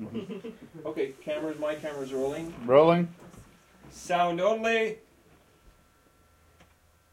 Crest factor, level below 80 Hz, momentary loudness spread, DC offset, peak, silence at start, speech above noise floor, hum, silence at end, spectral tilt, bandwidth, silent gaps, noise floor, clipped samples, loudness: 24 dB; -64 dBFS; 19 LU; under 0.1%; -6 dBFS; 0 s; 35 dB; none; 2.15 s; -6 dB/octave; 15.5 kHz; none; -62 dBFS; under 0.1%; -27 LUFS